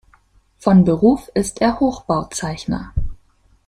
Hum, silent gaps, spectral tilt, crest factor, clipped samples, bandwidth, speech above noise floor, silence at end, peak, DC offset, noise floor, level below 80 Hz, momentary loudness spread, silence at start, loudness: none; none; -6.5 dB/octave; 16 dB; under 0.1%; 12.5 kHz; 39 dB; 0.5 s; -2 dBFS; under 0.1%; -55 dBFS; -34 dBFS; 12 LU; 0.65 s; -18 LUFS